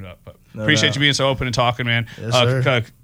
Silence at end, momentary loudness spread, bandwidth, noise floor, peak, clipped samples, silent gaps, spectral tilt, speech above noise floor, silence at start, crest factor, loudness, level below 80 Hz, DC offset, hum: 0.15 s; 5 LU; 16 kHz; -40 dBFS; -2 dBFS; under 0.1%; none; -4.5 dB/octave; 22 dB; 0 s; 16 dB; -18 LUFS; -44 dBFS; under 0.1%; none